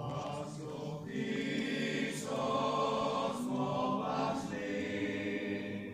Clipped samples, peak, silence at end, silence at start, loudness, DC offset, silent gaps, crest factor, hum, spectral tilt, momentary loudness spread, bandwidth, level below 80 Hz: under 0.1%; -22 dBFS; 0 s; 0 s; -36 LUFS; under 0.1%; none; 14 dB; none; -5.5 dB/octave; 8 LU; 15.5 kHz; -68 dBFS